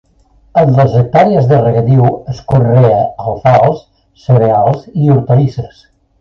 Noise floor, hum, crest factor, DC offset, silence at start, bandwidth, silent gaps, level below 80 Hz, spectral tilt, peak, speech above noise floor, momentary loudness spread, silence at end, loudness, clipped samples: -48 dBFS; none; 10 dB; under 0.1%; 0.55 s; 6.2 kHz; none; -40 dBFS; -10 dB/octave; 0 dBFS; 39 dB; 8 LU; 0.55 s; -10 LUFS; under 0.1%